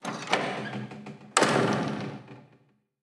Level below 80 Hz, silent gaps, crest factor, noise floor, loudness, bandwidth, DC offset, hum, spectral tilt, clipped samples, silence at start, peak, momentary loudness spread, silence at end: -72 dBFS; none; 28 dB; -64 dBFS; -28 LUFS; 13.5 kHz; under 0.1%; none; -4 dB/octave; under 0.1%; 0.05 s; -2 dBFS; 18 LU; 0.6 s